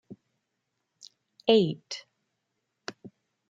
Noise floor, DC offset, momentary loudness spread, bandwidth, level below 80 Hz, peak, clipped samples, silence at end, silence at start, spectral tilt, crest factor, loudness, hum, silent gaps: -81 dBFS; under 0.1%; 21 LU; 7.8 kHz; -76 dBFS; -6 dBFS; under 0.1%; 0.4 s; 0.1 s; -5.5 dB/octave; 26 dB; -26 LUFS; none; none